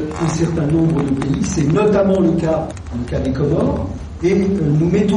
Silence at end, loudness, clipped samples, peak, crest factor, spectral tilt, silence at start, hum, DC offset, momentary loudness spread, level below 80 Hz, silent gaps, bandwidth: 0 s; -17 LUFS; under 0.1%; -4 dBFS; 12 dB; -7.5 dB/octave; 0 s; none; under 0.1%; 8 LU; -32 dBFS; none; 10 kHz